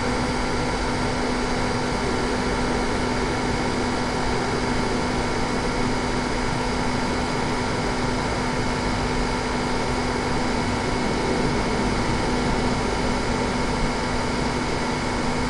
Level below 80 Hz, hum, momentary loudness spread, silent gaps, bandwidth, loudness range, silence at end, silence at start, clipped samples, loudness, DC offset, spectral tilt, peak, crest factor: -32 dBFS; none; 1 LU; none; 11.5 kHz; 1 LU; 0 s; 0 s; under 0.1%; -24 LUFS; under 0.1%; -5 dB/octave; -10 dBFS; 14 dB